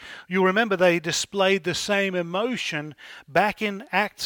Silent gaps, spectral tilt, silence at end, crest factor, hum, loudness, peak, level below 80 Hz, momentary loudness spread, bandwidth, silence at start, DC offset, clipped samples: none; -4 dB/octave; 0 s; 18 dB; none; -23 LUFS; -6 dBFS; -62 dBFS; 8 LU; 19 kHz; 0 s; under 0.1%; under 0.1%